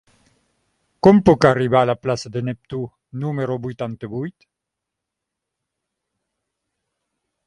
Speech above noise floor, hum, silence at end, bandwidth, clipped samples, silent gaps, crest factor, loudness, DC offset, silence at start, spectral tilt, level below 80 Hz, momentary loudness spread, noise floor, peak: 64 dB; none; 3.15 s; 11 kHz; under 0.1%; none; 22 dB; -19 LUFS; under 0.1%; 1.05 s; -7.5 dB/octave; -50 dBFS; 17 LU; -83 dBFS; 0 dBFS